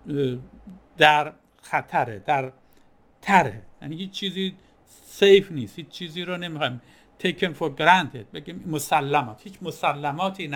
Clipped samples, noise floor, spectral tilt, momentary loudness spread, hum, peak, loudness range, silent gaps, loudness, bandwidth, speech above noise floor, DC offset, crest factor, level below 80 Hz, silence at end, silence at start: under 0.1%; -56 dBFS; -4.5 dB/octave; 19 LU; none; -2 dBFS; 3 LU; none; -23 LUFS; 19 kHz; 32 dB; under 0.1%; 24 dB; -60 dBFS; 0 s; 0.05 s